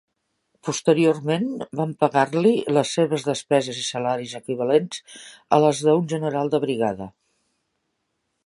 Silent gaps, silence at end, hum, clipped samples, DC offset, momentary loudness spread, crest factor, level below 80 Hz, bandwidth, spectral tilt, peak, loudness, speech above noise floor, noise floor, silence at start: none; 1.35 s; none; under 0.1%; under 0.1%; 12 LU; 20 dB; -66 dBFS; 11.5 kHz; -5.5 dB/octave; -2 dBFS; -22 LUFS; 54 dB; -75 dBFS; 0.65 s